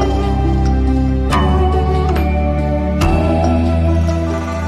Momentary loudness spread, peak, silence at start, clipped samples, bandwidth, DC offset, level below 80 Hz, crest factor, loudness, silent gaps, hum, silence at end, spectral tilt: 3 LU; -2 dBFS; 0 s; under 0.1%; 13 kHz; under 0.1%; -18 dBFS; 12 dB; -15 LUFS; none; none; 0 s; -7.5 dB/octave